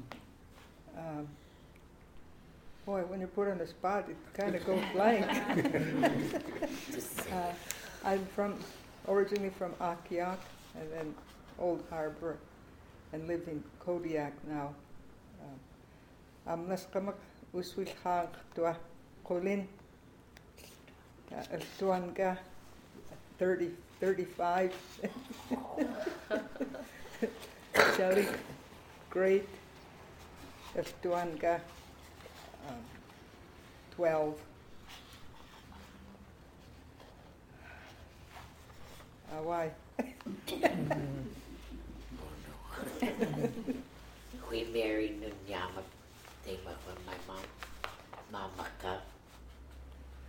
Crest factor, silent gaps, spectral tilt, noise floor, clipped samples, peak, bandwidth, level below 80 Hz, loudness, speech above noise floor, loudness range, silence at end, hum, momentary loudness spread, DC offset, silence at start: 32 dB; none; -5.5 dB/octave; -58 dBFS; under 0.1%; -6 dBFS; 17.5 kHz; -58 dBFS; -36 LUFS; 23 dB; 12 LU; 0 s; none; 23 LU; under 0.1%; 0 s